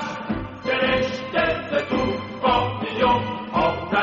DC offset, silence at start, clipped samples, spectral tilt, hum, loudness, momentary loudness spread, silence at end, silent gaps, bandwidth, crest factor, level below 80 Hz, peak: under 0.1%; 0 s; under 0.1%; -3 dB/octave; none; -23 LUFS; 7 LU; 0 s; none; 7.4 kHz; 16 dB; -44 dBFS; -6 dBFS